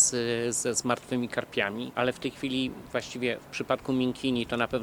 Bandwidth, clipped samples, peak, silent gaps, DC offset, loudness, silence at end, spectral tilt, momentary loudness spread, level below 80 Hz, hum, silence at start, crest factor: 19 kHz; under 0.1%; -8 dBFS; none; under 0.1%; -29 LUFS; 0 s; -3 dB/octave; 4 LU; -58 dBFS; none; 0 s; 22 dB